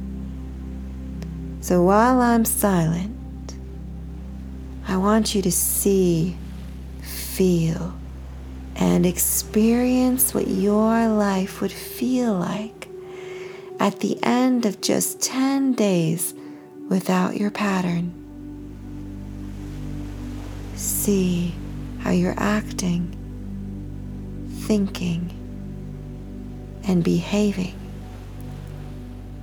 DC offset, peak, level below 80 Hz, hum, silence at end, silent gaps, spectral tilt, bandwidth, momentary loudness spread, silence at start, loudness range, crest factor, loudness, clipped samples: under 0.1%; -4 dBFS; -38 dBFS; none; 0 s; none; -5 dB/octave; over 20 kHz; 18 LU; 0 s; 7 LU; 20 dB; -22 LUFS; under 0.1%